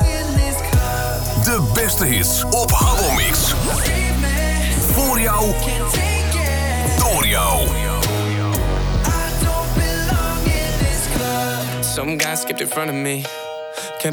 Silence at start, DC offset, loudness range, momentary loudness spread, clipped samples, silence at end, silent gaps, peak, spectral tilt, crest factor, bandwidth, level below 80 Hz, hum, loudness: 0 s; under 0.1%; 4 LU; 6 LU; under 0.1%; 0 s; none; -4 dBFS; -4 dB/octave; 12 dB; over 20 kHz; -22 dBFS; none; -18 LUFS